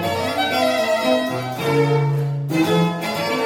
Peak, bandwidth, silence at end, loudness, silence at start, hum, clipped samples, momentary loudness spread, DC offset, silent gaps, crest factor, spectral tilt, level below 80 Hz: -6 dBFS; 17 kHz; 0 s; -19 LUFS; 0 s; none; under 0.1%; 5 LU; under 0.1%; none; 14 dB; -5.5 dB/octave; -60 dBFS